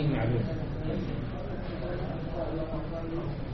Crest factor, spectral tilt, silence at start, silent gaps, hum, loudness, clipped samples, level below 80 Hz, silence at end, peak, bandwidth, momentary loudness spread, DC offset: 14 dB; -7.5 dB/octave; 0 s; none; none; -34 LUFS; under 0.1%; -40 dBFS; 0 s; -18 dBFS; 6 kHz; 7 LU; under 0.1%